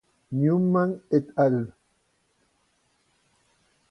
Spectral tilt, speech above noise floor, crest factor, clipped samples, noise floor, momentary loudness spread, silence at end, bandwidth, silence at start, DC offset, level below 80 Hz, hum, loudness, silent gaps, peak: -10.5 dB/octave; 47 dB; 18 dB; under 0.1%; -70 dBFS; 9 LU; 2.2 s; 6.2 kHz; 0.3 s; under 0.1%; -68 dBFS; none; -24 LUFS; none; -10 dBFS